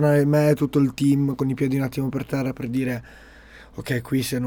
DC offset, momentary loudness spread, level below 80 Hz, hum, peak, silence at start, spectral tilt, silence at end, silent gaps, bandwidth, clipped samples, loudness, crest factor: under 0.1%; 10 LU; -50 dBFS; none; -8 dBFS; 0 s; -7 dB/octave; 0 s; none; 19.5 kHz; under 0.1%; -23 LUFS; 14 dB